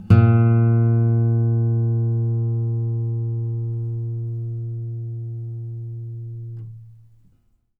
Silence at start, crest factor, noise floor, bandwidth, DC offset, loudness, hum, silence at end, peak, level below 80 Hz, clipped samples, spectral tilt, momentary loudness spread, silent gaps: 0 s; 18 dB; -61 dBFS; 2.9 kHz; under 0.1%; -21 LUFS; none; 0.85 s; -2 dBFS; -50 dBFS; under 0.1%; -11.5 dB/octave; 17 LU; none